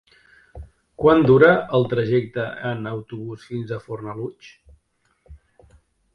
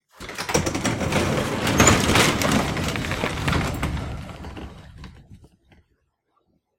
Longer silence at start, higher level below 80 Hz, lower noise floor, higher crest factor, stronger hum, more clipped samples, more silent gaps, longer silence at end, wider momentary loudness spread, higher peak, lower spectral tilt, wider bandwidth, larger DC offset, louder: first, 0.55 s vs 0.2 s; second, -50 dBFS vs -38 dBFS; about the same, -67 dBFS vs -70 dBFS; about the same, 22 dB vs 24 dB; neither; neither; neither; second, 0.8 s vs 1.35 s; about the same, 19 LU vs 21 LU; about the same, 0 dBFS vs 0 dBFS; first, -8.5 dB/octave vs -4 dB/octave; second, 6.2 kHz vs 16.5 kHz; neither; about the same, -20 LUFS vs -21 LUFS